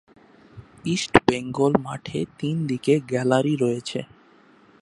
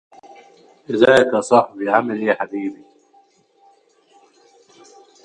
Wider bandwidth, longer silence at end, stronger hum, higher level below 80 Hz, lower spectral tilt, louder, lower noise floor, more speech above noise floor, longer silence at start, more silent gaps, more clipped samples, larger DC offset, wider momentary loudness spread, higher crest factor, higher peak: about the same, 11.5 kHz vs 11.5 kHz; second, 0.75 s vs 2.5 s; neither; first, -52 dBFS vs -62 dBFS; about the same, -6 dB/octave vs -5 dB/octave; second, -23 LUFS vs -17 LUFS; about the same, -54 dBFS vs -56 dBFS; second, 32 dB vs 39 dB; second, 0.55 s vs 0.9 s; neither; neither; neither; about the same, 11 LU vs 13 LU; about the same, 24 dB vs 20 dB; about the same, 0 dBFS vs 0 dBFS